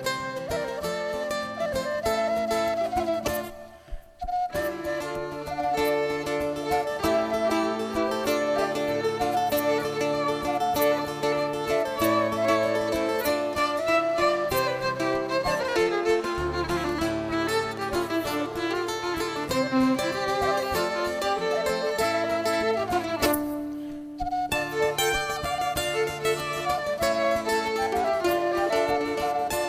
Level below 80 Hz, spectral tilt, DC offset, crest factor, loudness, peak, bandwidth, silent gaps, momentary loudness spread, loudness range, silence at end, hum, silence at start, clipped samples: -48 dBFS; -4 dB/octave; under 0.1%; 16 dB; -26 LUFS; -10 dBFS; 16 kHz; none; 6 LU; 3 LU; 0 s; none; 0 s; under 0.1%